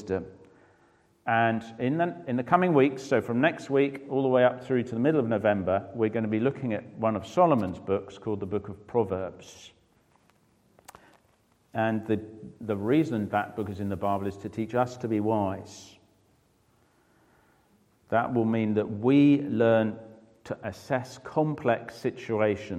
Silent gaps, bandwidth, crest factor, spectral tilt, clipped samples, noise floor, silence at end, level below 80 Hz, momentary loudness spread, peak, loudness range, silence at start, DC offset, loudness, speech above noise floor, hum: none; 12.5 kHz; 22 dB; -7.5 dB/octave; under 0.1%; -66 dBFS; 0 s; -66 dBFS; 12 LU; -6 dBFS; 9 LU; 0 s; under 0.1%; -27 LUFS; 39 dB; none